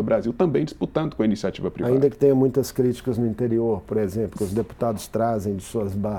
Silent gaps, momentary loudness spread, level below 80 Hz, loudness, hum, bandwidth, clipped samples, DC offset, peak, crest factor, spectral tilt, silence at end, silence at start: none; 8 LU; -48 dBFS; -23 LUFS; none; 18 kHz; under 0.1%; under 0.1%; -6 dBFS; 16 dB; -7.5 dB/octave; 0 s; 0 s